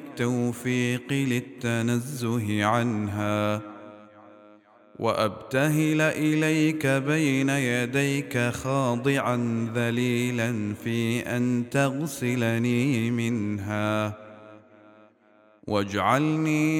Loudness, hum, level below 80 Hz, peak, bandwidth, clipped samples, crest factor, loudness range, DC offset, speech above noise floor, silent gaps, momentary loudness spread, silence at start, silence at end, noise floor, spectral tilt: -25 LUFS; none; -64 dBFS; -6 dBFS; 18 kHz; under 0.1%; 18 dB; 4 LU; under 0.1%; 34 dB; none; 6 LU; 0 s; 0 s; -59 dBFS; -6 dB/octave